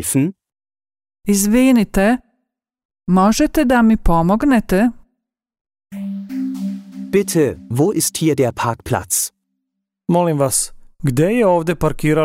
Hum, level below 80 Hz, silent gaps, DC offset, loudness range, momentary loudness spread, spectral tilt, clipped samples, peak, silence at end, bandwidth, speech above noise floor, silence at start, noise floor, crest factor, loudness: none; -32 dBFS; 2.85-2.89 s, 5.61-5.65 s; under 0.1%; 5 LU; 12 LU; -5.5 dB/octave; under 0.1%; -4 dBFS; 0 s; 16 kHz; 62 dB; 0 s; -77 dBFS; 14 dB; -16 LUFS